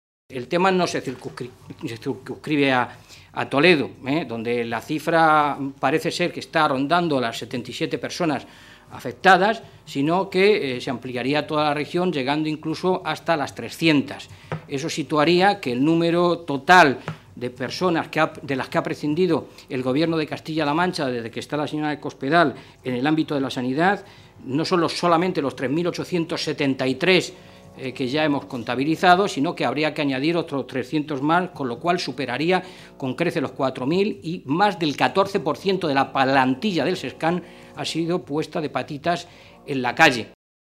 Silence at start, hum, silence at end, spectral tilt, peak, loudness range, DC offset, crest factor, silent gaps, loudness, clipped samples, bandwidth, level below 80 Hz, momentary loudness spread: 0.3 s; none; 0.35 s; -5.5 dB/octave; 0 dBFS; 4 LU; under 0.1%; 22 dB; none; -22 LUFS; under 0.1%; 15 kHz; -62 dBFS; 13 LU